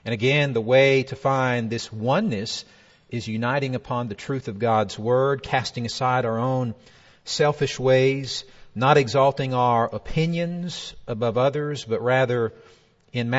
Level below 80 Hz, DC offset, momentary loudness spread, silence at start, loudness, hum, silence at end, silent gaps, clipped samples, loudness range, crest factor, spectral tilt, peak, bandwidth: -52 dBFS; under 0.1%; 12 LU; 0.05 s; -23 LUFS; none; 0 s; none; under 0.1%; 4 LU; 20 dB; -5.5 dB/octave; -2 dBFS; 8 kHz